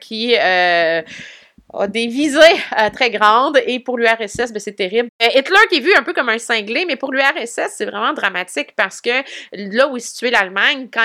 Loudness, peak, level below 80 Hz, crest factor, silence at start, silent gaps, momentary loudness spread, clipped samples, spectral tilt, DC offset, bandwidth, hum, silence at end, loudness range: -15 LUFS; 0 dBFS; -58 dBFS; 16 dB; 0 s; 5.09-5.19 s; 11 LU; under 0.1%; -2.5 dB/octave; under 0.1%; 16.5 kHz; none; 0 s; 4 LU